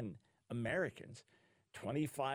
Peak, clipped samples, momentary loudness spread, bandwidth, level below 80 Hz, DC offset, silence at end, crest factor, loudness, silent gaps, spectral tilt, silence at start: -26 dBFS; under 0.1%; 19 LU; 19 kHz; -74 dBFS; under 0.1%; 0 s; 16 dB; -41 LUFS; none; -6 dB/octave; 0 s